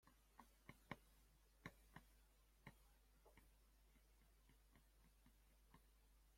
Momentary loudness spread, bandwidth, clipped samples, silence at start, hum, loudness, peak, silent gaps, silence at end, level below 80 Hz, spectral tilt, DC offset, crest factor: 8 LU; 16.5 kHz; under 0.1%; 0 s; none; -65 LUFS; -36 dBFS; none; 0 s; -76 dBFS; -4.5 dB/octave; under 0.1%; 34 dB